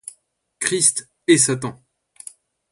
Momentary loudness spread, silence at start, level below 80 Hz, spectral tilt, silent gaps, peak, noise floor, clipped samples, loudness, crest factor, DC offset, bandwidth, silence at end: 23 LU; 0.6 s; -64 dBFS; -3 dB/octave; none; 0 dBFS; -58 dBFS; under 0.1%; -18 LUFS; 22 dB; under 0.1%; 11.5 kHz; 1 s